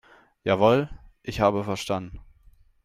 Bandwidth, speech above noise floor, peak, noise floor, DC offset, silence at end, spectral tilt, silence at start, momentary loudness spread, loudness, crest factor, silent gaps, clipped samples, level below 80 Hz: 15 kHz; 33 dB; -6 dBFS; -56 dBFS; under 0.1%; 0.65 s; -6 dB/octave; 0.45 s; 17 LU; -24 LUFS; 20 dB; none; under 0.1%; -48 dBFS